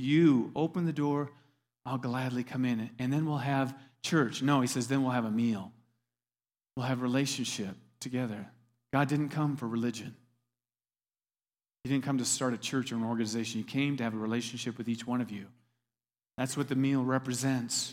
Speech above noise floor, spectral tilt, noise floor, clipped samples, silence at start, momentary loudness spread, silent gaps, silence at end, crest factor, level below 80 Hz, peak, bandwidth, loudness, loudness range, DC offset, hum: over 59 dB; -5 dB/octave; under -90 dBFS; under 0.1%; 0 s; 10 LU; none; 0 s; 18 dB; -74 dBFS; -14 dBFS; 16 kHz; -32 LUFS; 5 LU; under 0.1%; none